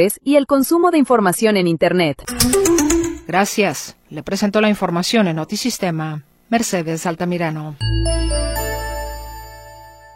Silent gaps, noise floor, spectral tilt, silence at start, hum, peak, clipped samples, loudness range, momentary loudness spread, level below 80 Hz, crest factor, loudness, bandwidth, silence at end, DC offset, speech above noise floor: none; -40 dBFS; -4.5 dB/octave; 0 s; none; 0 dBFS; under 0.1%; 6 LU; 14 LU; -30 dBFS; 18 dB; -17 LUFS; 16.5 kHz; 0.2 s; under 0.1%; 23 dB